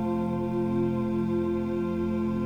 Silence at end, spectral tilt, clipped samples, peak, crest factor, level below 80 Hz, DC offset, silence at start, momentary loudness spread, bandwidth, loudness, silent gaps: 0 s; -9.5 dB/octave; under 0.1%; -18 dBFS; 10 dB; -50 dBFS; under 0.1%; 0 s; 2 LU; 7 kHz; -28 LUFS; none